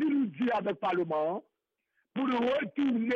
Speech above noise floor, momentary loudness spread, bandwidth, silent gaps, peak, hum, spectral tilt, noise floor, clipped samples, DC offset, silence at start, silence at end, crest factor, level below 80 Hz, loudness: 50 dB; 5 LU; 6.6 kHz; none; -22 dBFS; none; -7.5 dB/octave; -79 dBFS; under 0.1%; under 0.1%; 0 s; 0 s; 8 dB; -74 dBFS; -31 LUFS